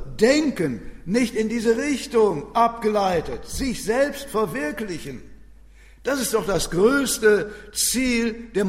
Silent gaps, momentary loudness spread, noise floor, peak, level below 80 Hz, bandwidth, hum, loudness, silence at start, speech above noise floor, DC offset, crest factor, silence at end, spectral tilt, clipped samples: none; 11 LU; -47 dBFS; -4 dBFS; -42 dBFS; 16 kHz; none; -22 LUFS; 0 s; 25 dB; under 0.1%; 18 dB; 0 s; -4 dB/octave; under 0.1%